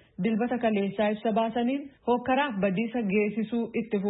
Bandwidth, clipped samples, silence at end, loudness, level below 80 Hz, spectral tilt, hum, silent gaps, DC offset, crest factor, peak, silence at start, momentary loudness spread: 4 kHz; under 0.1%; 0 s; -28 LUFS; -64 dBFS; -11 dB/octave; none; none; under 0.1%; 14 dB; -14 dBFS; 0.2 s; 4 LU